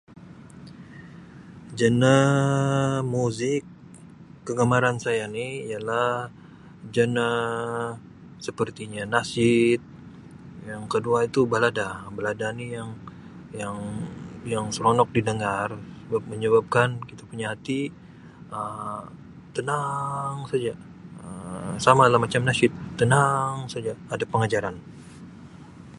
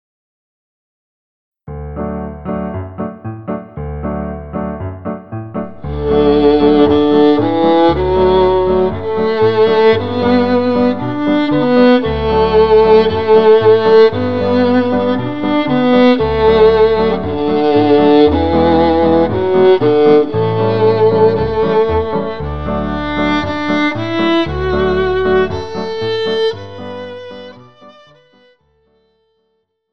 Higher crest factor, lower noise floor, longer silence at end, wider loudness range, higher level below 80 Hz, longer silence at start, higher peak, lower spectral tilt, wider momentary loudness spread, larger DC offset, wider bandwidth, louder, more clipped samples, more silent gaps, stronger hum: first, 24 dB vs 12 dB; second, -46 dBFS vs -66 dBFS; about the same, 0 s vs 0 s; second, 8 LU vs 13 LU; second, -56 dBFS vs -32 dBFS; second, 0.1 s vs 1.5 s; about the same, -2 dBFS vs 0 dBFS; second, -5.5 dB/octave vs -8 dB/octave; first, 24 LU vs 15 LU; second, under 0.1% vs 2%; first, 11.5 kHz vs 6.2 kHz; second, -24 LUFS vs -12 LUFS; neither; neither; neither